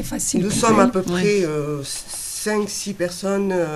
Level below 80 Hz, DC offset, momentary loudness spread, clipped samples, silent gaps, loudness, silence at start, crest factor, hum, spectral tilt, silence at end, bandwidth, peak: -44 dBFS; under 0.1%; 10 LU; under 0.1%; none; -20 LUFS; 0 s; 18 dB; none; -4.5 dB/octave; 0 s; 14.5 kHz; -2 dBFS